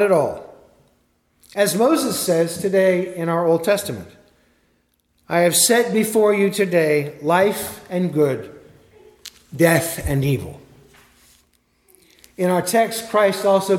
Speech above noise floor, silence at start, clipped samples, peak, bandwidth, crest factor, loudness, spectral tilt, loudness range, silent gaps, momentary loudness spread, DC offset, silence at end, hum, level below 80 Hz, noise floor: 46 dB; 0 s; under 0.1%; 0 dBFS; 17.5 kHz; 20 dB; -18 LUFS; -4.5 dB/octave; 6 LU; none; 13 LU; under 0.1%; 0 s; none; -48 dBFS; -64 dBFS